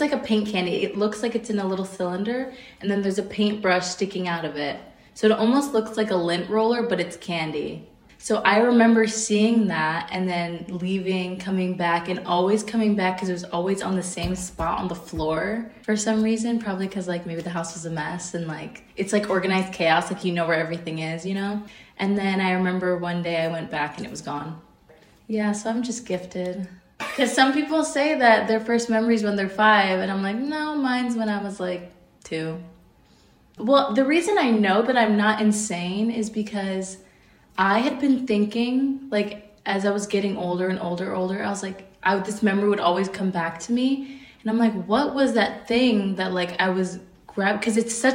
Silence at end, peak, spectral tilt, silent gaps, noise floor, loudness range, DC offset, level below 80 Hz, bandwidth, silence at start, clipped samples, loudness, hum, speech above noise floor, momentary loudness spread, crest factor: 0 s; -4 dBFS; -5 dB/octave; none; -56 dBFS; 5 LU; under 0.1%; -54 dBFS; 16 kHz; 0 s; under 0.1%; -23 LUFS; none; 33 dB; 11 LU; 20 dB